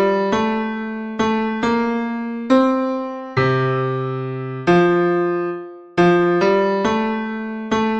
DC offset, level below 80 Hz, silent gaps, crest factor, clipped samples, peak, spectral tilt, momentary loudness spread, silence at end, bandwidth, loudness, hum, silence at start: under 0.1%; -50 dBFS; none; 16 dB; under 0.1%; -2 dBFS; -7 dB/octave; 10 LU; 0 s; 8 kHz; -19 LUFS; none; 0 s